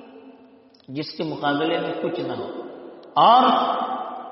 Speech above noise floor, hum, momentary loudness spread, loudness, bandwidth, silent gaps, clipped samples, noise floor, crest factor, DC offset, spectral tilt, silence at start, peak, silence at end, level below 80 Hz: 31 dB; none; 20 LU; -21 LUFS; 5.8 kHz; none; under 0.1%; -51 dBFS; 20 dB; under 0.1%; -2.5 dB/octave; 0 s; -4 dBFS; 0 s; -72 dBFS